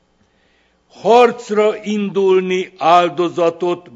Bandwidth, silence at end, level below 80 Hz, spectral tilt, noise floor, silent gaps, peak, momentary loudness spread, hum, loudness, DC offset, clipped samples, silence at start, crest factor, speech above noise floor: 7.8 kHz; 0.15 s; -66 dBFS; -5.5 dB/octave; -58 dBFS; none; 0 dBFS; 9 LU; none; -15 LUFS; under 0.1%; under 0.1%; 1.05 s; 16 dB; 43 dB